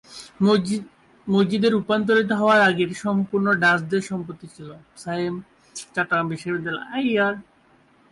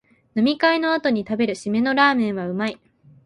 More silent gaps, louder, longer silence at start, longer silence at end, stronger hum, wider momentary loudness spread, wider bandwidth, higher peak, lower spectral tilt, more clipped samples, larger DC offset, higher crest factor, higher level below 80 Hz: neither; about the same, -21 LUFS vs -21 LUFS; second, 0.1 s vs 0.35 s; first, 0.7 s vs 0.5 s; neither; first, 20 LU vs 9 LU; about the same, 11.5 kHz vs 11 kHz; second, -8 dBFS vs -4 dBFS; about the same, -5.5 dB/octave vs -5.5 dB/octave; neither; neither; about the same, 14 dB vs 18 dB; about the same, -62 dBFS vs -62 dBFS